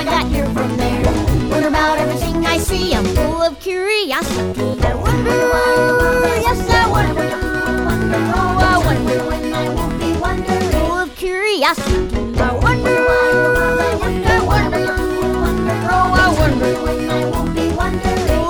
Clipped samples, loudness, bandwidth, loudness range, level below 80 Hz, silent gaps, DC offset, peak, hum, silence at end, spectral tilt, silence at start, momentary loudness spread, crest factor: under 0.1%; -16 LUFS; over 20 kHz; 2 LU; -24 dBFS; none; 0.2%; -2 dBFS; none; 0 s; -5.5 dB/octave; 0 s; 6 LU; 14 dB